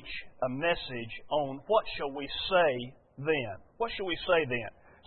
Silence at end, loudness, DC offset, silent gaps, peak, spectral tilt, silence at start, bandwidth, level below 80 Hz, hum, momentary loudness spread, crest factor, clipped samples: 0.15 s; -31 LUFS; under 0.1%; none; -12 dBFS; -8.5 dB/octave; 0 s; 4.4 kHz; -56 dBFS; none; 12 LU; 18 dB; under 0.1%